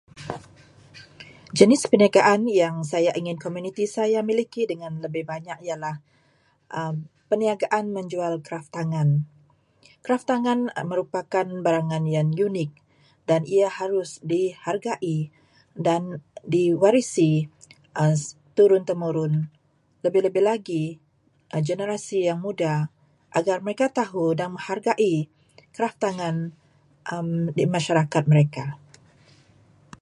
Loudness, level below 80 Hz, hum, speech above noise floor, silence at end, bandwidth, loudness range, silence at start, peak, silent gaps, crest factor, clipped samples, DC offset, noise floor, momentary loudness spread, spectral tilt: -24 LUFS; -68 dBFS; none; 41 dB; 1.25 s; 11.5 kHz; 7 LU; 0.15 s; 0 dBFS; none; 24 dB; under 0.1%; under 0.1%; -63 dBFS; 15 LU; -6.5 dB/octave